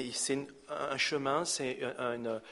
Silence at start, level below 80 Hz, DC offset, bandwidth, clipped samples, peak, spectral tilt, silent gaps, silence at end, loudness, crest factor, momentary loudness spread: 0 s; -74 dBFS; under 0.1%; 11.5 kHz; under 0.1%; -18 dBFS; -2.5 dB/octave; none; 0 s; -34 LUFS; 18 dB; 7 LU